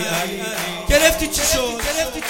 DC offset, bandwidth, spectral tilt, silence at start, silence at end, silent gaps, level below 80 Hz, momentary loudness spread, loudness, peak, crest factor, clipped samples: under 0.1%; 17 kHz; -2 dB/octave; 0 s; 0 s; none; -30 dBFS; 9 LU; -18 LUFS; 0 dBFS; 20 dB; under 0.1%